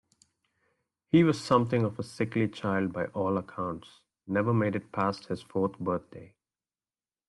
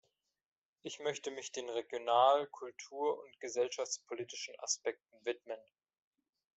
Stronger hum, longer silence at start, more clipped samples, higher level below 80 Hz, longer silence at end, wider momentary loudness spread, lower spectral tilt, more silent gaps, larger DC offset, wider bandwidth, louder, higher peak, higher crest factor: neither; first, 1.15 s vs 0.85 s; neither; first, -66 dBFS vs -90 dBFS; about the same, 1 s vs 0.95 s; second, 12 LU vs 17 LU; first, -7.5 dB/octave vs -1.5 dB/octave; neither; neither; first, 12 kHz vs 8.2 kHz; first, -29 LUFS vs -37 LUFS; first, -10 dBFS vs -16 dBFS; about the same, 20 dB vs 24 dB